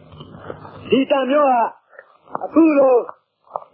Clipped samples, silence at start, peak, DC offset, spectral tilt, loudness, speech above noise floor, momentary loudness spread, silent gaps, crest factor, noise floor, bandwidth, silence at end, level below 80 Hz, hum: under 0.1%; 0.2 s; -4 dBFS; under 0.1%; -10.5 dB/octave; -16 LUFS; 32 dB; 22 LU; none; 16 dB; -47 dBFS; 4.7 kHz; 0.15 s; -60 dBFS; none